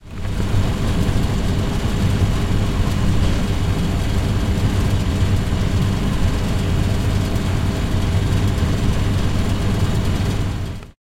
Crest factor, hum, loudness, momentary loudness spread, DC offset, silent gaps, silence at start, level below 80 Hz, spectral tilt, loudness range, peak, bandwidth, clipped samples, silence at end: 12 dB; none; -20 LUFS; 2 LU; under 0.1%; none; 0 s; -24 dBFS; -6.5 dB/octave; 0 LU; -6 dBFS; 16 kHz; under 0.1%; 0.25 s